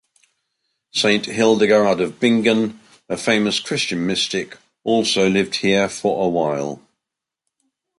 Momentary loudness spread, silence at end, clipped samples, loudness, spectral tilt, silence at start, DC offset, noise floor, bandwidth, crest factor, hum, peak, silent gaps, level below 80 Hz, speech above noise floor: 10 LU; 1.2 s; under 0.1%; -18 LUFS; -4 dB/octave; 0.95 s; under 0.1%; -84 dBFS; 11.5 kHz; 18 dB; none; -2 dBFS; none; -58 dBFS; 66 dB